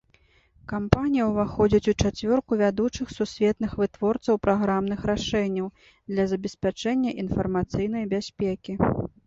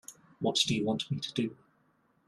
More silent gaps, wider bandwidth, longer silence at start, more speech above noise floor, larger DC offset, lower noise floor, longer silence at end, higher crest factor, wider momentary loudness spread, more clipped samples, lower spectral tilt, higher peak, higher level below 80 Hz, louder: neither; second, 7.8 kHz vs 14.5 kHz; first, 0.7 s vs 0.1 s; about the same, 37 dB vs 39 dB; neither; second, -61 dBFS vs -70 dBFS; second, 0.2 s vs 0.75 s; about the same, 24 dB vs 22 dB; about the same, 7 LU vs 9 LU; neither; first, -6.5 dB/octave vs -4 dB/octave; first, -2 dBFS vs -12 dBFS; first, -44 dBFS vs -68 dBFS; first, -25 LUFS vs -31 LUFS